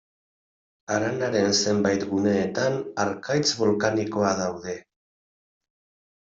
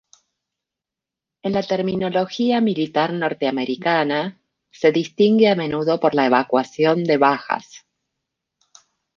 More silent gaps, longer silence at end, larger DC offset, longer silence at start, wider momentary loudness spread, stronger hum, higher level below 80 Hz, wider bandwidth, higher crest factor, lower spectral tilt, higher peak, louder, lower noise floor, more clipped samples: neither; about the same, 1.4 s vs 1.4 s; neither; second, 0.9 s vs 1.45 s; about the same, 8 LU vs 7 LU; neither; about the same, -64 dBFS vs -62 dBFS; about the same, 7.8 kHz vs 7.2 kHz; about the same, 18 dB vs 18 dB; second, -4 dB/octave vs -6.5 dB/octave; second, -8 dBFS vs -2 dBFS; second, -24 LUFS vs -19 LUFS; about the same, under -90 dBFS vs -87 dBFS; neither